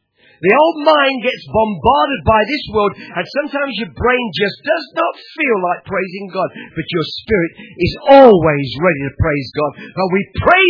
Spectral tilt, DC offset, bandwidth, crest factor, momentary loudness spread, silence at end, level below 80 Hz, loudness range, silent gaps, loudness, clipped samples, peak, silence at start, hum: -7.5 dB/octave; under 0.1%; 5.4 kHz; 14 dB; 11 LU; 0 s; -38 dBFS; 6 LU; none; -15 LUFS; 0.3%; 0 dBFS; 0.4 s; none